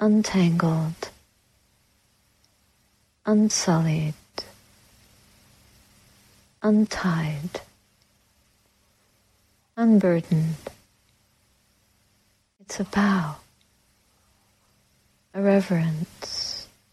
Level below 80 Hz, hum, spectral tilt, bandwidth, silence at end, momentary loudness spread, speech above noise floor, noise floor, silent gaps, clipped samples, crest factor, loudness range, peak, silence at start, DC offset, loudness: -58 dBFS; none; -6 dB/octave; 13.5 kHz; 0.3 s; 17 LU; 44 dB; -66 dBFS; none; under 0.1%; 18 dB; 4 LU; -8 dBFS; 0 s; under 0.1%; -24 LUFS